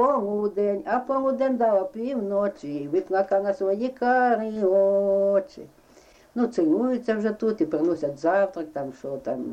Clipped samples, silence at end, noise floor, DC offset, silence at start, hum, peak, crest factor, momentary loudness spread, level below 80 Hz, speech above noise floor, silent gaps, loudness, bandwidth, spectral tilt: under 0.1%; 0 s; -54 dBFS; under 0.1%; 0 s; none; -10 dBFS; 14 dB; 10 LU; -64 dBFS; 30 dB; none; -24 LUFS; 8.4 kHz; -7.5 dB/octave